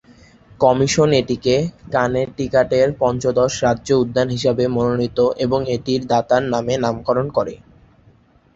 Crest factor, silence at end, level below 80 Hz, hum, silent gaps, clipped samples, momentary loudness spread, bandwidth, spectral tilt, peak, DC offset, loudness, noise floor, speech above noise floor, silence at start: 16 dB; 1 s; -46 dBFS; none; none; under 0.1%; 5 LU; 8 kHz; -5.5 dB/octave; -2 dBFS; under 0.1%; -18 LUFS; -52 dBFS; 35 dB; 0.6 s